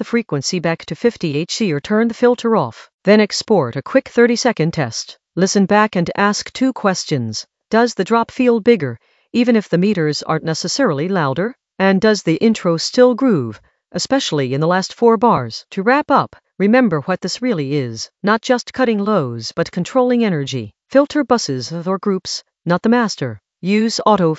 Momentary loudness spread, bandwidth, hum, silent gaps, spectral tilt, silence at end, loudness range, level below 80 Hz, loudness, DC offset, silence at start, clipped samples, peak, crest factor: 9 LU; 8.2 kHz; none; 2.94-2.99 s; -5 dB/octave; 0 s; 2 LU; -56 dBFS; -17 LUFS; under 0.1%; 0 s; under 0.1%; 0 dBFS; 16 dB